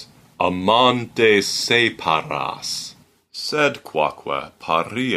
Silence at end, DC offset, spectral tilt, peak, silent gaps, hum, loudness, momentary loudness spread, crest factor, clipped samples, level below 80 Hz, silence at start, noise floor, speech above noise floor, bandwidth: 0 s; under 0.1%; -3.5 dB/octave; -4 dBFS; none; none; -19 LUFS; 12 LU; 18 dB; under 0.1%; -60 dBFS; 0 s; -44 dBFS; 24 dB; 15.5 kHz